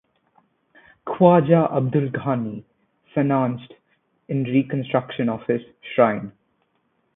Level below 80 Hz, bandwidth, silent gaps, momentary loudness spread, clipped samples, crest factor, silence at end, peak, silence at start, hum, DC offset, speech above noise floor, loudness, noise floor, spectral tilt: -62 dBFS; 3.9 kHz; none; 16 LU; under 0.1%; 22 dB; 0.85 s; 0 dBFS; 1.05 s; none; under 0.1%; 49 dB; -21 LUFS; -69 dBFS; -12.5 dB/octave